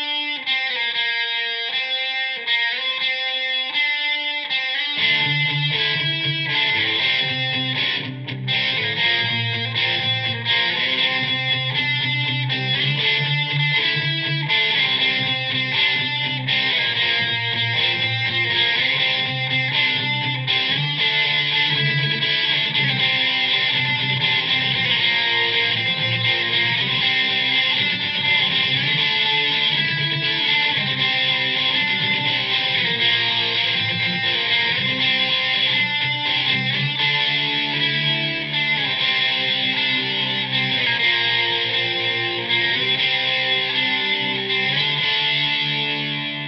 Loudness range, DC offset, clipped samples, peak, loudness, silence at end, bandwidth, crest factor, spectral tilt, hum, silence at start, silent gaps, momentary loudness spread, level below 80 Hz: 2 LU; under 0.1%; under 0.1%; -6 dBFS; -18 LUFS; 0 s; 6.4 kHz; 14 dB; -4.5 dB/octave; none; 0 s; none; 4 LU; -64 dBFS